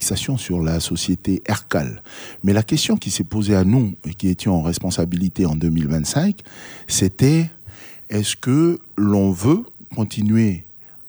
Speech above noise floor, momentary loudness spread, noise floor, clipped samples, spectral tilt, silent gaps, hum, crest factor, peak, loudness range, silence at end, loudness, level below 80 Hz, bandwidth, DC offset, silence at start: 20 dB; 13 LU; -39 dBFS; under 0.1%; -5.5 dB/octave; none; none; 16 dB; -2 dBFS; 1 LU; 0 s; -19 LUFS; -42 dBFS; over 20 kHz; under 0.1%; 0 s